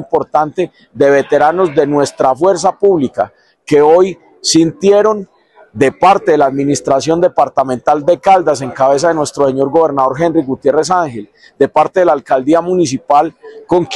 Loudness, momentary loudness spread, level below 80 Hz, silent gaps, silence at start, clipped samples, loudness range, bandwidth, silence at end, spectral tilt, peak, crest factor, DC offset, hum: -12 LUFS; 6 LU; -52 dBFS; none; 0 s; under 0.1%; 2 LU; 12 kHz; 0 s; -5 dB/octave; 0 dBFS; 12 dB; under 0.1%; none